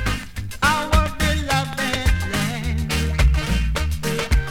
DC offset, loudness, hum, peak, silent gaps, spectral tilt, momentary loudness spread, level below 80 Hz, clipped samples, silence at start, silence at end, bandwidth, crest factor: under 0.1%; -21 LUFS; none; -4 dBFS; none; -4.5 dB/octave; 5 LU; -24 dBFS; under 0.1%; 0 s; 0 s; 18 kHz; 16 dB